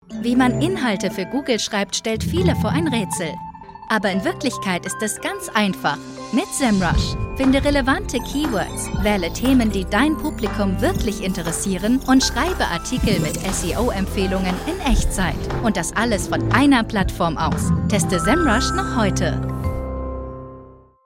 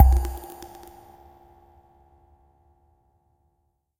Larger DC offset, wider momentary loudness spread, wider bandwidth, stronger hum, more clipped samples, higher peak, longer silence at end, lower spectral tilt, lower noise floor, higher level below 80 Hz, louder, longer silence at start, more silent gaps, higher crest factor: neither; second, 8 LU vs 29 LU; about the same, 16.5 kHz vs 16 kHz; neither; neither; about the same, -2 dBFS vs -2 dBFS; second, 0.3 s vs 3.35 s; second, -5 dB/octave vs -7 dB/octave; second, -43 dBFS vs -73 dBFS; about the same, -30 dBFS vs -28 dBFS; first, -20 LUFS vs -26 LUFS; about the same, 0.1 s vs 0 s; neither; second, 16 dB vs 26 dB